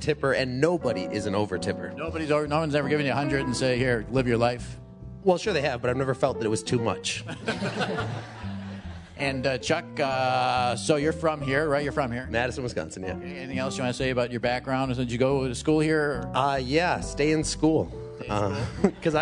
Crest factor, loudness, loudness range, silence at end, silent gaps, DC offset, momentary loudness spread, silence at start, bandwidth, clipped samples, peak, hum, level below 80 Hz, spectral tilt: 20 dB; -26 LUFS; 3 LU; 0 s; none; under 0.1%; 9 LU; 0 s; 11 kHz; under 0.1%; -6 dBFS; none; -46 dBFS; -5.5 dB/octave